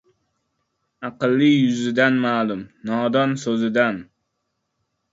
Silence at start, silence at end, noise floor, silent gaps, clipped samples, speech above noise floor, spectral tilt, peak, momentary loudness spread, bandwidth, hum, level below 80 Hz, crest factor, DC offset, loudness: 1 s; 1.1 s; -75 dBFS; none; under 0.1%; 56 dB; -6 dB/octave; -4 dBFS; 13 LU; 7.8 kHz; none; -66 dBFS; 18 dB; under 0.1%; -20 LUFS